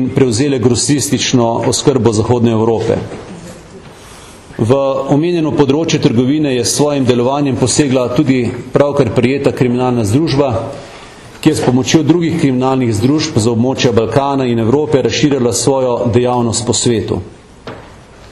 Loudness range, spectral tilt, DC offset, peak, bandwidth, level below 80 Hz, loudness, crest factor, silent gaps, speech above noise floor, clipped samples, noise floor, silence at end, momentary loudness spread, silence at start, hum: 3 LU; -5.5 dB/octave; under 0.1%; 0 dBFS; 13 kHz; -42 dBFS; -13 LUFS; 12 dB; none; 24 dB; under 0.1%; -36 dBFS; 0.05 s; 9 LU; 0 s; none